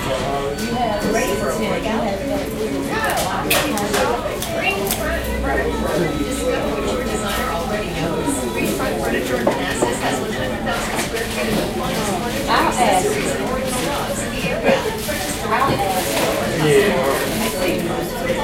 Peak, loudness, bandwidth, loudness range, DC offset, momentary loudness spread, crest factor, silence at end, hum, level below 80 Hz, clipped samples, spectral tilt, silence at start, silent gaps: -2 dBFS; -20 LUFS; 17 kHz; 2 LU; under 0.1%; 5 LU; 18 dB; 0 s; none; -34 dBFS; under 0.1%; -4 dB/octave; 0 s; none